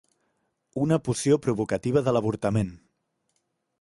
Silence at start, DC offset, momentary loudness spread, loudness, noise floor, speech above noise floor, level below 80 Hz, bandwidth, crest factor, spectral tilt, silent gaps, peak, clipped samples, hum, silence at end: 0.75 s; under 0.1%; 6 LU; -25 LUFS; -75 dBFS; 51 dB; -54 dBFS; 11.5 kHz; 18 dB; -6.5 dB/octave; none; -8 dBFS; under 0.1%; none; 1.05 s